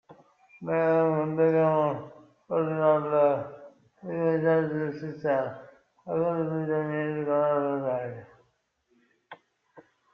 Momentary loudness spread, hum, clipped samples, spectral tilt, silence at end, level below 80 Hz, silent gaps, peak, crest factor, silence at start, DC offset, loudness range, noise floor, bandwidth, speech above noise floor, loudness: 15 LU; none; under 0.1%; -10 dB/octave; 0.35 s; -72 dBFS; none; -10 dBFS; 18 dB; 0.1 s; under 0.1%; 5 LU; -72 dBFS; 5.4 kHz; 46 dB; -27 LUFS